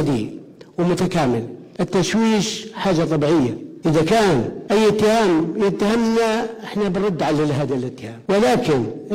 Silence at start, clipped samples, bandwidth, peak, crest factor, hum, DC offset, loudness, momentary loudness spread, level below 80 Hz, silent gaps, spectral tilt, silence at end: 0 s; under 0.1%; 16 kHz; -4 dBFS; 14 dB; none; under 0.1%; -19 LUFS; 9 LU; -48 dBFS; none; -6 dB/octave; 0 s